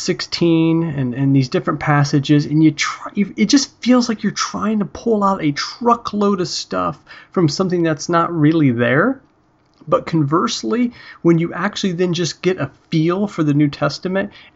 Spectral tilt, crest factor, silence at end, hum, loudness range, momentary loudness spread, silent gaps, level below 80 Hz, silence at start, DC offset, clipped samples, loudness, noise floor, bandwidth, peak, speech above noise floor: -5.5 dB/octave; 14 dB; 0.15 s; none; 2 LU; 6 LU; none; -52 dBFS; 0 s; under 0.1%; under 0.1%; -17 LUFS; -57 dBFS; 8 kHz; -2 dBFS; 40 dB